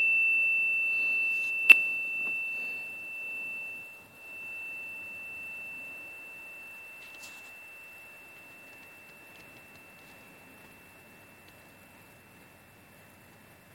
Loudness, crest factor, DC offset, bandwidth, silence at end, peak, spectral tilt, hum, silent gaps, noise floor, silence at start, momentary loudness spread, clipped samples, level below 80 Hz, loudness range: -26 LUFS; 30 dB; under 0.1%; 17 kHz; 1.7 s; -4 dBFS; -1 dB/octave; none; none; -56 dBFS; 0 s; 26 LU; under 0.1%; -76 dBFS; 26 LU